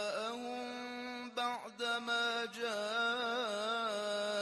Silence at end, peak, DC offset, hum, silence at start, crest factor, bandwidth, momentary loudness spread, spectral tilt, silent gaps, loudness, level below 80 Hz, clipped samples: 0 s; -24 dBFS; under 0.1%; none; 0 s; 14 dB; 13 kHz; 8 LU; -2 dB/octave; none; -37 LUFS; -84 dBFS; under 0.1%